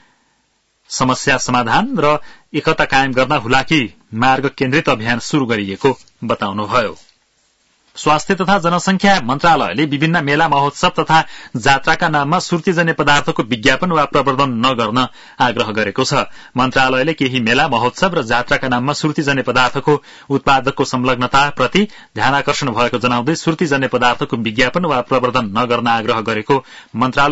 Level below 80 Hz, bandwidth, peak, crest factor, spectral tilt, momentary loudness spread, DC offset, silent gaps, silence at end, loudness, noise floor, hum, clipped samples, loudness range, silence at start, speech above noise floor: -42 dBFS; 8 kHz; 0 dBFS; 16 dB; -4.5 dB/octave; 5 LU; under 0.1%; none; 0 s; -15 LUFS; -62 dBFS; none; under 0.1%; 2 LU; 0.9 s; 47 dB